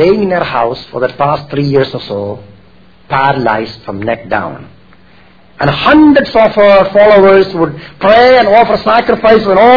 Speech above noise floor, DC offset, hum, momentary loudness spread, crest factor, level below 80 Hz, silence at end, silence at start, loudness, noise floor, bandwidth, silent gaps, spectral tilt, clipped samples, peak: 34 dB; 0.8%; none; 12 LU; 10 dB; -38 dBFS; 0 s; 0 s; -9 LUFS; -43 dBFS; 5.4 kHz; none; -7.5 dB/octave; 1%; 0 dBFS